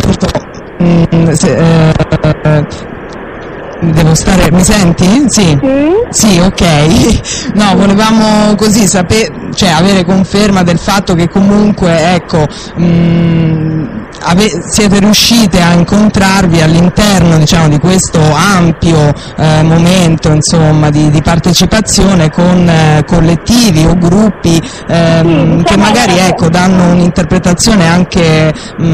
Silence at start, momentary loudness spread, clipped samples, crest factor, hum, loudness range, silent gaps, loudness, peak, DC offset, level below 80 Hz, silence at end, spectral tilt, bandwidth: 0 s; 6 LU; under 0.1%; 6 dB; none; 3 LU; none; -7 LUFS; 0 dBFS; under 0.1%; -24 dBFS; 0 s; -5 dB/octave; 15.5 kHz